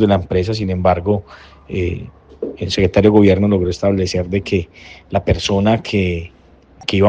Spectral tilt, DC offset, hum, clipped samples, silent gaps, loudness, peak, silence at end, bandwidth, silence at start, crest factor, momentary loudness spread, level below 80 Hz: -6.5 dB/octave; under 0.1%; none; under 0.1%; none; -17 LUFS; 0 dBFS; 0 s; 8.8 kHz; 0 s; 16 dB; 15 LU; -38 dBFS